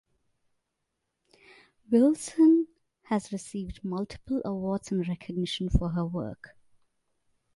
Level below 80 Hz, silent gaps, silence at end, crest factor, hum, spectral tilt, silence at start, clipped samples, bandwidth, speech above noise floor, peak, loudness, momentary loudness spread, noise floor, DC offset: -44 dBFS; none; 1.1 s; 18 dB; none; -6.5 dB/octave; 1.9 s; under 0.1%; 11.5 kHz; 55 dB; -10 dBFS; -28 LUFS; 14 LU; -82 dBFS; under 0.1%